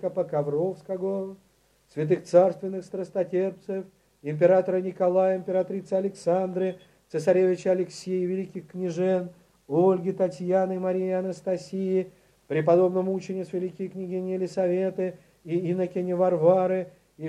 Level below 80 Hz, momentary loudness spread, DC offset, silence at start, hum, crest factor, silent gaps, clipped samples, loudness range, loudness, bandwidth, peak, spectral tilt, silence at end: -72 dBFS; 12 LU; under 0.1%; 0 s; none; 20 dB; none; under 0.1%; 2 LU; -26 LUFS; 10.5 kHz; -6 dBFS; -8 dB/octave; 0 s